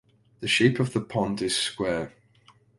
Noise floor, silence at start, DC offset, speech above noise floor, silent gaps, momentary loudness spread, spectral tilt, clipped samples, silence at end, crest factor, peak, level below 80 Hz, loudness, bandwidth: -59 dBFS; 0.4 s; under 0.1%; 34 dB; none; 11 LU; -4.5 dB/octave; under 0.1%; 0.7 s; 20 dB; -6 dBFS; -56 dBFS; -25 LUFS; 11.5 kHz